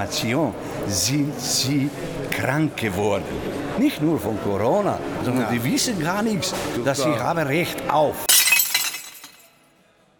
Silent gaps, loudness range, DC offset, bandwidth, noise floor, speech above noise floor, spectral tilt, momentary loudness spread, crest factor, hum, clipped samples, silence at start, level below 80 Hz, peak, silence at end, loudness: none; 4 LU; under 0.1%; over 20 kHz; -58 dBFS; 35 dB; -3.5 dB/octave; 11 LU; 20 dB; none; under 0.1%; 0 s; -50 dBFS; -2 dBFS; 0.9 s; -21 LUFS